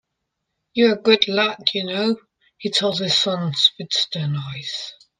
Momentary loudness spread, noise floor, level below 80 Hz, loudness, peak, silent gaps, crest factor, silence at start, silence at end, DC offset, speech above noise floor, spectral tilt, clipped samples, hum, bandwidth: 12 LU; -78 dBFS; -66 dBFS; -19 LUFS; 0 dBFS; none; 22 dB; 0.75 s; 0.25 s; under 0.1%; 58 dB; -4 dB/octave; under 0.1%; none; 9.8 kHz